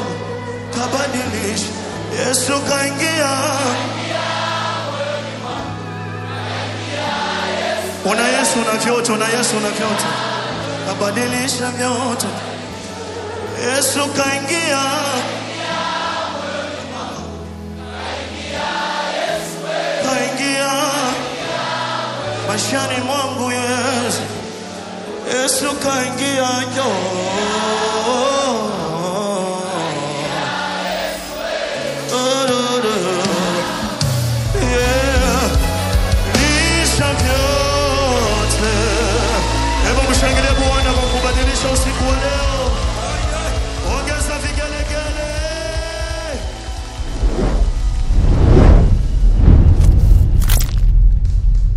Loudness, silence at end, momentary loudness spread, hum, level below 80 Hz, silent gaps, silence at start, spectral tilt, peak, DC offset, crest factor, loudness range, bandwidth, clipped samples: -18 LUFS; 0 s; 10 LU; none; -20 dBFS; none; 0 s; -4 dB/octave; 0 dBFS; under 0.1%; 16 dB; 7 LU; 15 kHz; under 0.1%